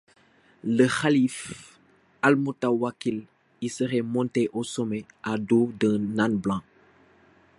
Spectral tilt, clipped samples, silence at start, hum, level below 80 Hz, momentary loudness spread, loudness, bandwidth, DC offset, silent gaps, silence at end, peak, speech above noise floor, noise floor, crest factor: -6 dB/octave; under 0.1%; 0.65 s; none; -62 dBFS; 12 LU; -26 LUFS; 11.5 kHz; under 0.1%; none; 0.95 s; -4 dBFS; 35 dB; -60 dBFS; 22 dB